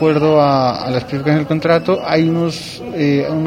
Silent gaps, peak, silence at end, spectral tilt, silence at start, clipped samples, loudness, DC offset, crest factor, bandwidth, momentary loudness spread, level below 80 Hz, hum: none; 0 dBFS; 0 s; -7 dB/octave; 0 s; under 0.1%; -15 LUFS; under 0.1%; 14 dB; 14.5 kHz; 8 LU; -48 dBFS; none